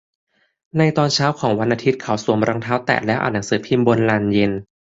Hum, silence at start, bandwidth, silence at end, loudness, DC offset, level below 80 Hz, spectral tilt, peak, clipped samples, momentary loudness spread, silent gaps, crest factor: none; 0.75 s; 8 kHz; 0.25 s; -18 LUFS; under 0.1%; -52 dBFS; -5.5 dB/octave; -2 dBFS; under 0.1%; 5 LU; none; 18 dB